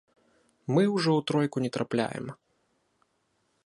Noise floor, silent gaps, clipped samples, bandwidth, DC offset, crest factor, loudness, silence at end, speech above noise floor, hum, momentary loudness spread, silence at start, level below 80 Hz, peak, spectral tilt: -74 dBFS; none; under 0.1%; 11.5 kHz; under 0.1%; 20 dB; -27 LUFS; 1.3 s; 47 dB; none; 15 LU; 0.7 s; -72 dBFS; -10 dBFS; -6.5 dB/octave